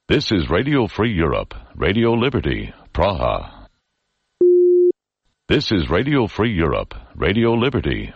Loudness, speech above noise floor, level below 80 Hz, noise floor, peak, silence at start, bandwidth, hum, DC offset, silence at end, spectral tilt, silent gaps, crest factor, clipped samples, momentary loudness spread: -18 LUFS; 54 dB; -34 dBFS; -73 dBFS; -4 dBFS; 0.1 s; 7 kHz; none; under 0.1%; 0.05 s; -7.5 dB/octave; none; 14 dB; under 0.1%; 10 LU